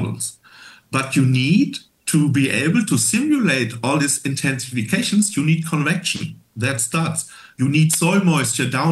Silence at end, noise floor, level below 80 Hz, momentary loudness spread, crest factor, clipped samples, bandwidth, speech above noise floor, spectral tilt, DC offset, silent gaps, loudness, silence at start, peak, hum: 0 s; -45 dBFS; -62 dBFS; 9 LU; 16 dB; under 0.1%; 12.5 kHz; 27 dB; -4.5 dB/octave; under 0.1%; none; -19 LUFS; 0 s; -4 dBFS; none